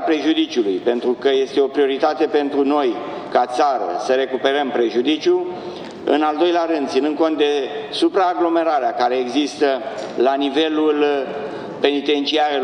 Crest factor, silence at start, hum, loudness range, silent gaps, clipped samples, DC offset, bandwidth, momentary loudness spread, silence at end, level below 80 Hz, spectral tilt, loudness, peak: 16 dB; 0 s; none; 1 LU; none; under 0.1%; under 0.1%; 10 kHz; 6 LU; 0 s; -66 dBFS; -4 dB/octave; -19 LUFS; -2 dBFS